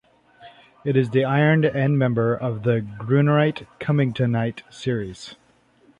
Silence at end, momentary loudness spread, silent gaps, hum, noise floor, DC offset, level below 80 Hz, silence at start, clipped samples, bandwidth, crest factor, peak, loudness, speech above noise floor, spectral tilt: 0.65 s; 12 LU; none; none; -57 dBFS; under 0.1%; -56 dBFS; 0.4 s; under 0.1%; 9.4 kHz; 16 dB; -6 dBFS; -21 LUFS; 36 dB; -8 dB/octave